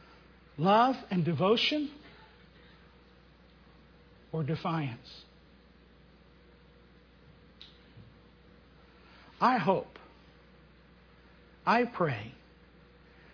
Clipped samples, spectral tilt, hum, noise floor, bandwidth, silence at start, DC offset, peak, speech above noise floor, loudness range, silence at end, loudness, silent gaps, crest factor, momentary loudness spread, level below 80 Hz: under 0.1%; -4 dB/octave; 60 Hz at -60 dBFS; -59 dBFS; 5.4 kHz; 0.55 s; under 0.1%; -12 dBFS; 30 dB; 10 LU; 1 s; -29 LUFS; none; 22 dB; 27 LU; -64 dBFS